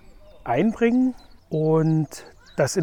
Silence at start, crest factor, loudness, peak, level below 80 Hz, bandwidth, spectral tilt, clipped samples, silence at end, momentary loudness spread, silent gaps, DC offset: 0.1 s; 14 dB; -22 LUFS; -8 dBFS; -52 dBFS; 16.5 kHz; -6.5 dB/octave; under 0.1%; 0 s; 13 LU; none; under 0.1%